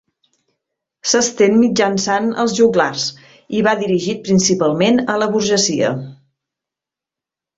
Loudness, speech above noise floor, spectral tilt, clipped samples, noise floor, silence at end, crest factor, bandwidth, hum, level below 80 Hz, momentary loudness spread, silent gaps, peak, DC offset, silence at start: -16 LUFS; 72 dB; -4 dB/octave; under 0.1%; -87 dBFS; 1.45 s; 16 dB; 8 kHz; none; -56 dBFS; 9 LU; none; -2 dBFS; under 0.1%; 1.05 s